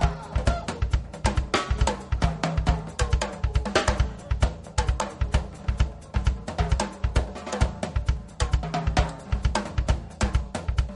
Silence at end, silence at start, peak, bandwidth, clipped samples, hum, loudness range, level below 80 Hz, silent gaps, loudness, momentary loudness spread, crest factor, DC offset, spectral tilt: 0 s; 0 s; -6 dBFS; 11.5 kHz; under 0.1%; none; 2 LU; -28 dBFS; none; -27 LUFS; 4 LU; 20 dB; under 0.1%; -5 dB/octave